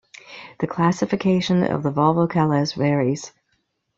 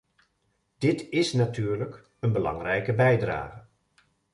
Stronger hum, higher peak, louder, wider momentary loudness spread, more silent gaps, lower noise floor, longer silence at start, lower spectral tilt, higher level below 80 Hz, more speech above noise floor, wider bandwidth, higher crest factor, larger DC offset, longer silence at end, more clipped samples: neither; first, -4 dBFS vs -10 dBFS; first, -21 LUFS vs -27 LUFS; first, 18 LU vs 10 LU; neither; about the same, -70 dBFS vs -73 dBFS; second, 0.3 s vs 0.8 s; about the same, -6.5 dB/octave vs -6.5 dB/octave; about the same, -56 dBFS vs -54 dBFS; about the same, 51 dB vs 48 dB; second, 7.6 kHz vs 11.5 kHz; about the same, 18 dB vs 18 dB; neither; about the same, 0.7 s vs 0.75 s; neither